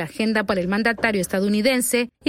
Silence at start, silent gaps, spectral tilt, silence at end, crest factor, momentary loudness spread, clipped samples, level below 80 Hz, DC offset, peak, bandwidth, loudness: 0 s; none; -4 dB/octave; 0 s; 16 dB; 3 LU; under 0.1%; -52 dBFS; under 0.1%; -6 dBFS; 16 kHz; -21 LUFS